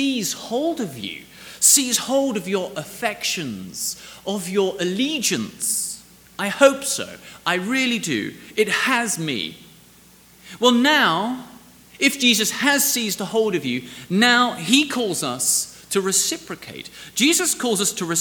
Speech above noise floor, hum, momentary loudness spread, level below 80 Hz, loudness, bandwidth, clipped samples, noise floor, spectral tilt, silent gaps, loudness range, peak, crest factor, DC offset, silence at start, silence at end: 29 dB; none; 14 LU; -62 dBFS; -20 LUFS; over 20 kHz; under 0.1%; -50 dBFS; -2 dB/octave; none; 5 LU; 0 dBFS; 22 dB; under 0.1%; 0 s; 0 s